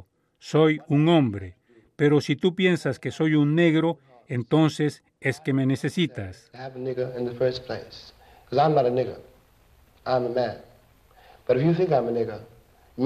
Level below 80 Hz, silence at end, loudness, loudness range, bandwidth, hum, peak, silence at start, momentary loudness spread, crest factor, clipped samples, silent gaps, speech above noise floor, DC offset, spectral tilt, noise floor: -62 dBFS; 0 s; -24 LUFS; 5 LU; 12 kHz; none; -8 dBFS; 0.45 s; 18 LU; 18 dB; under 0.1%; none; 35 dB; under 0.1%; -7 dB/octave; -58 dBFS